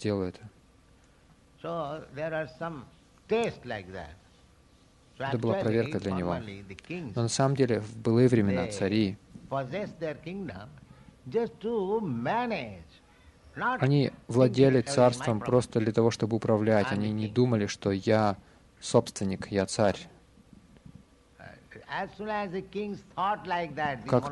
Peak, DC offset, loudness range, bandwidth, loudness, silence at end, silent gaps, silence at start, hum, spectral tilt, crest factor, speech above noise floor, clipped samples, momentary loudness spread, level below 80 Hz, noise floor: -8 dBFS; under 0.1%; 10 LU; 11.5 kHz; -29 LUFS; 0 s; none; 0 s; none; -6.5 dB/octave; 22 dB; 32 dB; under 0.1%; 16 LU; -60 dBFS; -60 dBFS